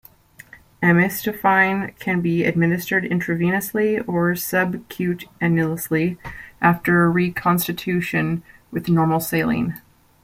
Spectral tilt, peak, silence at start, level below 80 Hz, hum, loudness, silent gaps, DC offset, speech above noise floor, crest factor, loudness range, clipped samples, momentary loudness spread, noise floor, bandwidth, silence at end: -6 dB/octave; -2 dBFS; 0.55 s; -52 dBFS; none; -20 LUFS; none; under 0.1%; 28 dB; 18 dB; 2 LU; under 0.1%; 9 LU; -47 dBFS; 16.5 kHz; 0.45 s